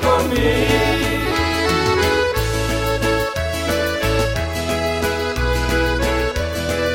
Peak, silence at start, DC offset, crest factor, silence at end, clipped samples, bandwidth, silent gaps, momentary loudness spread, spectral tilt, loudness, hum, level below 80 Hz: -4 dBFS; 0 s; under 0.1%; 16 dB; 0 s; under 0.1%; 16.5 kHz; none; 5 LU; -4.5 dB/octave; -18 LUFS; none; -28 dBFS